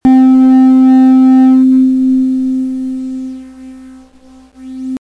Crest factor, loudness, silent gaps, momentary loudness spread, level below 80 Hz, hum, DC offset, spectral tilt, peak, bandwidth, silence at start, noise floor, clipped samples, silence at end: 8 dB; -8 LUFS; none; 18 LU; -46 dBFS; none; under 0.1%; -7 dB/octave; -2 dBFS; 4.4 kHz; 0.05 s; -40 dBFS; under 0.1%; 0 s